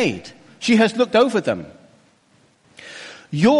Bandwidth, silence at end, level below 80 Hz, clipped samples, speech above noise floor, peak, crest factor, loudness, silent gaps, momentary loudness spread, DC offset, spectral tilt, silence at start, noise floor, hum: 11.5 kHz; 0 s; -60 dBFS; under 0.1%; 40 dB; -6 dBFS; 14 dB; -19 LUFS; none; 22 LU; under 0.1%; -5.5 dB/octave; 0 s; -57 dBFS; none